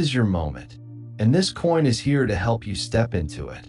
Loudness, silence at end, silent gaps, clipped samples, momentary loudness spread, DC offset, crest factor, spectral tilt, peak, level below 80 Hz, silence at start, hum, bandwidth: -22 LUFS; 0 s; none; under 0.1%; 17 LU; under 0.1%; 14 dB; -6 dB/octave; -8 dBFS; -42 dBFS; 0 s; none; 11.5 kHz